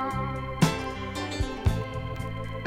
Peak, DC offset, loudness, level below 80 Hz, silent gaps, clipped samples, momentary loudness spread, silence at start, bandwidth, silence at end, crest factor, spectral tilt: -6 dBFS; under 0.1%; -30 LUFS; -38 dBFS; none; under 0.1%; 8 LU; 0 s; 16.5 kHz; 0 s; 22 dB; -5.5 dB/octave